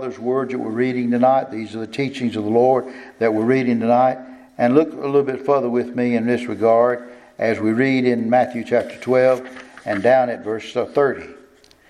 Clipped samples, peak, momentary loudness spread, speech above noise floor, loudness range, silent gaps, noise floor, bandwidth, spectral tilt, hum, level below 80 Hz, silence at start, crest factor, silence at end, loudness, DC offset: under 0.1%; -2 dBFS; 10 LU; 32 dB; 1 LU; none; -50 dBFS; 11 kHz; -7 dB/octave; none; -64 dBFS; 0 s; 18 dB; 0.55 s; -19 LUFS; under 0.1%